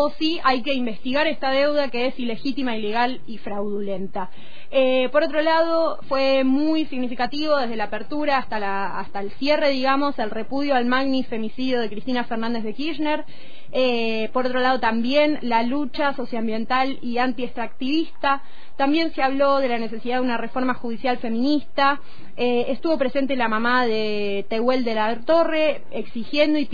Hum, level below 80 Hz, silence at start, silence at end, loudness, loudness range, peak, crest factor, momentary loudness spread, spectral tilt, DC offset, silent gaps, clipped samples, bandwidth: none; -52 dBFS; 0 s; 0.05 s; -22 LUFS; 3 LU; -6 dBFS; 18 dB; 8 LU; -6 dB/octave; 6%; none; under 0.1%; 5 kHz